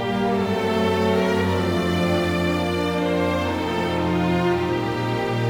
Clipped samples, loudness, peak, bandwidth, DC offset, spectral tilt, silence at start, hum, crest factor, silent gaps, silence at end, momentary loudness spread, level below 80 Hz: under 0.1%; -22 LUFS; -8 dBFS; 19.5 kHz; under 0.1%; -6.5 dB/octave; 0 s; none; 12 dB; none; 0 s; 3 LU; -44 dBFS